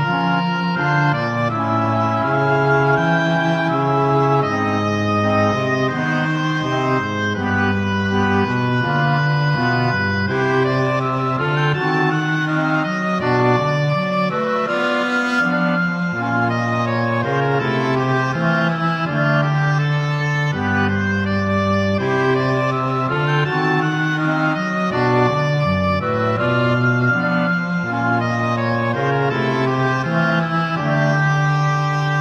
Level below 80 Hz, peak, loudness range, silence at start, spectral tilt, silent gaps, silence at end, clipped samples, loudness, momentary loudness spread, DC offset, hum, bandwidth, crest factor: -52 dBFS; -4 dBFS; 1 LU; 0 s; -7 dB/octave; none; 0 s; under 0.1%; -18 LUFS; 3 LU; under 0.1%; none; 8 kHz; 14 dB